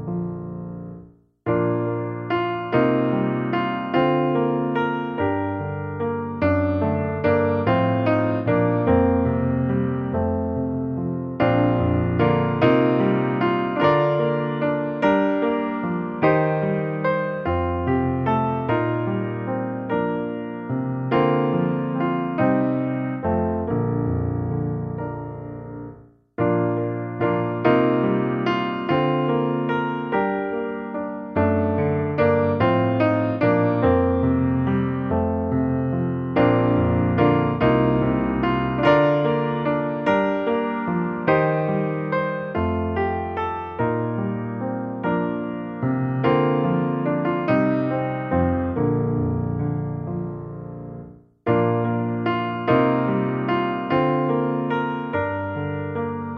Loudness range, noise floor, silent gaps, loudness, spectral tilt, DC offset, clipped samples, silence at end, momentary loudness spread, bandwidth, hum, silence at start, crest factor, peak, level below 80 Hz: 5 LU; -46 dBFS; none; -22 LUFS; -10 dB/octave; under 0.1%; under 0.1%; 0 s; 8 LU; 5.8 kHz; none; 0 s; 18 dB; -4 dBFS; -44 dBFS